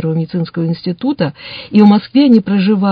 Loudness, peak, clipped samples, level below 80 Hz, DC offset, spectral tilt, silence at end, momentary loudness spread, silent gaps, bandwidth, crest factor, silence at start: -13 LUFS; 0 dBFS; 0.3%; -54 dBFS; under 0.1%; -10 dB/octave; 0 s; 10 LU; none; 5.2 kHz; 12 dB; 0 s